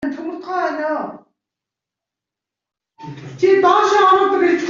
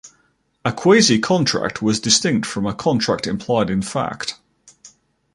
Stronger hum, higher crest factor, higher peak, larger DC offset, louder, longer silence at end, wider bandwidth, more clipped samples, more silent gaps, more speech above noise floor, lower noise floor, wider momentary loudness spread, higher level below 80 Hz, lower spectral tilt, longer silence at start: neither; about the same, 16 dB vs 18 dB; about the same, -2 dBFS vs 0 dBFS; neither; first, -15 LUFS vs -18 LUFS; second, 0 s vs 0.45 s; second, 7.6 kHz vs 11.5 kHz; neither; neither; first, 73 dB vs 45 dB; first, -86 dBFS vs -63 dBFS; first, 20 LU vs 12 LU; second, -64 dBFS vs -50 dBFS; about the same, -5 dB/octave vs -4 dB/octave; about the same, 0 s vs 0.05 s